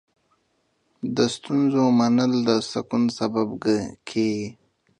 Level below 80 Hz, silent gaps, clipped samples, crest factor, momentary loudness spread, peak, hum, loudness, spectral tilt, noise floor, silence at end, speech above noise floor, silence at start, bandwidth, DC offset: -62 dBFS; none; under 0.1%; 18 dB; 10 LU; -4 dBFS; none; -23 LUFS; -5.5 dB/octave; -69 dBFS; 0.45 s; 47 dB; 1.05 s; 10 kHz; under 0.1%